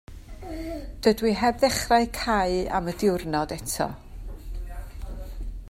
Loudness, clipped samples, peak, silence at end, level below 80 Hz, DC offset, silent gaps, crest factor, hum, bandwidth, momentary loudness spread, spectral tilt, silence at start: -25 LUFS; under 0.1%; -6 dBFS; 0 s; -38 dBFS; under 0.1%; none; 20 dB; none; 16 kHz; 18 LU; -4.5 dB/octave; 0.1 s